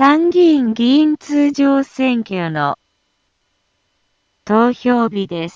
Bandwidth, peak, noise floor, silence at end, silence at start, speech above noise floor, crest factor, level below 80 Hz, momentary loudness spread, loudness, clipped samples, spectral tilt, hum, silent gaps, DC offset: 7.6 kHz; 0 dBFS; -66 dBFS; 0.05 s; 0 s; 52 dB; 16 dB; -60 dBFS; 9 LU; -15 LUFS; under 0.1%; -6.5 dB/octave; none; none; under 0.1%